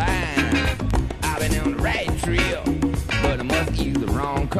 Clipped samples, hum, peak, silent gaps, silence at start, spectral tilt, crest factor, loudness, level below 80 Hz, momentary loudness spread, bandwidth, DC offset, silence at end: under 0.1%; none; -4 dBFS; none; 0 s; -5 dB/octave; 18 dB; -22 LUFS; -28 dBFS; 3 LU; 15 kHz; under 0.1%; 0 s